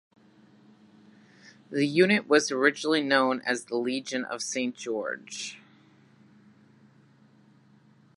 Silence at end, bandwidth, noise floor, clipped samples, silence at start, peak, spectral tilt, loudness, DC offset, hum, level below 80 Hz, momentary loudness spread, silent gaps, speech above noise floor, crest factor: 2.6 s; 11.5 kHz; -59 dBFS; under 0.1%; 1.45 s; -6 dBFS; -3.5 dB/octave; -26 LUFS; under 0.1%; none; -82 dBFS; 13 LU; none; 33 dB; 24 dB